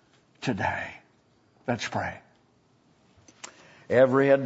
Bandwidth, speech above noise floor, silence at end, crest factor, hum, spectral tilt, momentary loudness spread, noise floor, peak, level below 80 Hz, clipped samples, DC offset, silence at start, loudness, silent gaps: 8 kHz; 40 dB; 0 s; 20 dB; none; -6 dB/octave; 25 LU; -64 dBFS; -8 dBFS; -66 dBFS; under 0.1%; under 0.1%; 0.4 s; -26 LUFS; none